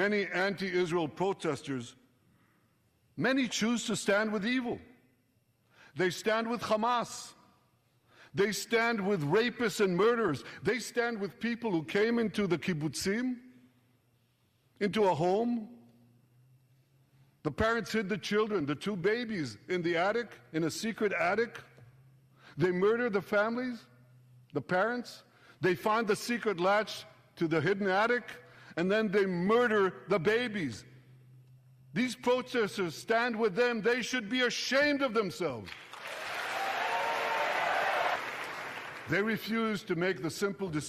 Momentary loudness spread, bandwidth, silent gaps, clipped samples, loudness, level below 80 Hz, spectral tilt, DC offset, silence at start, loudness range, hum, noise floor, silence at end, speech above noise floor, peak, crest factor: 11 LU; 15.5 kHz; none; under 0.1%; -31 LUFS; -66 dBFS; -4.5 dB/octave; under 0.1%; 0 s; 4 LU; none; -72 dBFS; 0 s; 41 dB; -14 dBFS; 18 dB